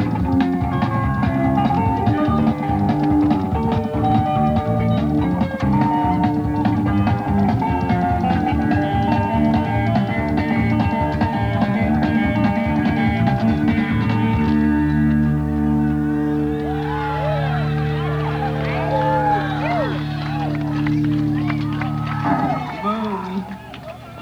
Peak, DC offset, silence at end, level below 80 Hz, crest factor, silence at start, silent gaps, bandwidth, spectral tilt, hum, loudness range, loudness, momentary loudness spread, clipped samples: -4 dBFS; under 0.1%; 0 s; -34 dBFS; 14 dB; 0 s; none; 10.5 kHz; -8.5 dB/octave; none; 3 LU; -19 LUFS; 5 LU; under 0.1%